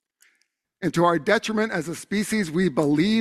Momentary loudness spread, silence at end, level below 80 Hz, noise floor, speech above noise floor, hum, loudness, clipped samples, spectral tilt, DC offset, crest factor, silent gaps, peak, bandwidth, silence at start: 7 LU; 0 s; -60 dBFS; -71 dBFS; 49 dB; none; -23 LUFS; under 0.1%; -5.5 dB/octave; under 0.1%; 18 dB; none; -4 dBFS; 14 kHz; 0.8 s